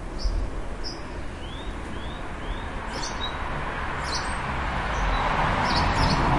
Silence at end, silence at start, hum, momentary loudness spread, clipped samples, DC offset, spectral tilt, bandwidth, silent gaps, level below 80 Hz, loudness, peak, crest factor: 0 s; 0 s; none; 12 LU; under 0.1%; 0.1%; -4.5 dB/octave; 11.5 kHz; none; -32 dBFS; -28 LUFS; -8 dBFS; 18 dB